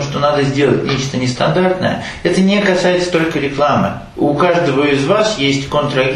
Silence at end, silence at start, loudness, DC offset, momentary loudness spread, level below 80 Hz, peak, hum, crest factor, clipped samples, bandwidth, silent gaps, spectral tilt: 0 s; 0 s; -14 LUFS; under 0.1%; 5 LU; -40 dBFS; 0 dBFS; none; 14 dB; under 0.1%; 11.5 kHz; none; -5.5 dB/octave